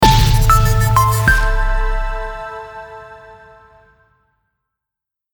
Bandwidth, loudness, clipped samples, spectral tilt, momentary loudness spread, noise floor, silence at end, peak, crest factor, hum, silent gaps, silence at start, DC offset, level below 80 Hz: over 20 kHz; -15 LUFS; under 0.1%; -4.5 dB/octave; 21 LU; -84 dBFS; 2.15 s; 0 dBFS; 16 dB; none; none; 0 s; under 0.1%; -20 dBFS